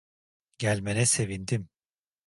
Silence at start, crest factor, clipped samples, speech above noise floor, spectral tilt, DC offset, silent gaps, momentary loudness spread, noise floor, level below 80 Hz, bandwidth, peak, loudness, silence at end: 0.6 s; 20 dB; under 0.1%; over 63 dB; -4 dB/octave; under 0.1%; none; 9 LU; under -90 dBFS; -56 dBFS; 11.5 kHz; -12 dBFS; -27 LUFS; 0.6 s